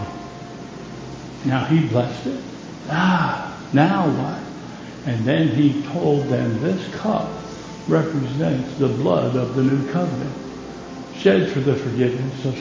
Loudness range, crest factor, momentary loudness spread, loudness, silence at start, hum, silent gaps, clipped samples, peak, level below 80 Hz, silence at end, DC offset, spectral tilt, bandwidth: 2 LU; 20 dB; 17 LU; -21 LUFS; 0 s; none; none; under 0.1%; -2 dBFS; -50 dBFS; 0 s; under 0.1%; -7.5 dB/octave; 7.6 kHz